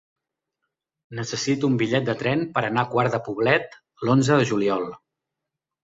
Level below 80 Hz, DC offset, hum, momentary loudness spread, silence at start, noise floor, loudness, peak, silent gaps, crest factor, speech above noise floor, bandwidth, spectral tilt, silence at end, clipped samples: -60 dBFS; under 0.1%; none; 10 LU; 1.1 s; -85 dBFS; -22 LUFS; -4 dBFS; none; 20 dB; 63 dB; 7.8 kHz; -5.5 dB/octave; 1 s; under 0.1%